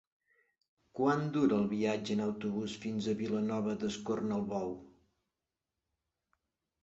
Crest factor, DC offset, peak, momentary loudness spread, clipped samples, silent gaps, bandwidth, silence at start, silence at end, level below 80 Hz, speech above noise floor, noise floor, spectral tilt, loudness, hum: 20 dB; under 0.1%; -16 dBFS; 8 LU; under 0.1%; none; 8 kHz; 0.95 s; 1.95 s; -70 dBFS; 56 dB; -90 dBFS; -6 dB/octave; -34 LUFS; none